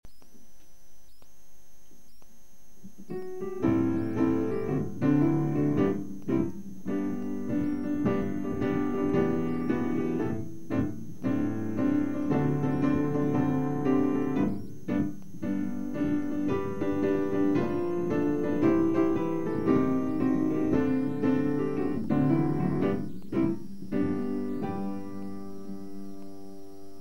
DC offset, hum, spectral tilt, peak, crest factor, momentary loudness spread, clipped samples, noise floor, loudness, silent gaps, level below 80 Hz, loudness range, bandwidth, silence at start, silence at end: 2%; none; -9 dB/octave; -12 dBFS; 16 dB; 12 LU; under 0.1%; -56 dBFS; -29 LUFS; none; -54 dBFS; 5 LU; 16 kHz; 0.2 s; 0 s